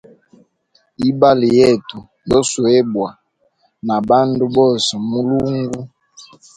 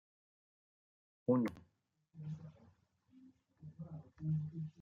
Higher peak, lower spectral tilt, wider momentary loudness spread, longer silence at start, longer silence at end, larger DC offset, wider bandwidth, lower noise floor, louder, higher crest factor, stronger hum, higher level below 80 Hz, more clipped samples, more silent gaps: first, 0 dBFS vs -22 dBFS; second, -5.5 dB/octave vs -10 dB/octave; second, 15 LU vs 23 LU; second, 1 s vs 1.3 s; first, 0.35 s vs 0 s; neither; first, 10.5 kHz vs 6.8 kHz; second, -61 dBFS vs -80 dBFS; first, -15 LUFS vs -41 LUFS; second, 16 dB vs 22 dB; neither; first, -48 dBFS vs -76 dBFS; neither; neither